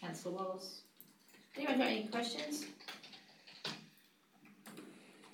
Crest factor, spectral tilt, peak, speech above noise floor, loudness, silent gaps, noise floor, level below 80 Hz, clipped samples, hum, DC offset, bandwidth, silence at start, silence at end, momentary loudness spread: 24 dB; -3.5 dB/octave; -20 dBFS; 29 dB; -41 LUFS; none; -69 dBFS; under -90 dBFS; under 0.1%; none; under 0.1%; 19 kHz; 0 s; 0 s; 24 LU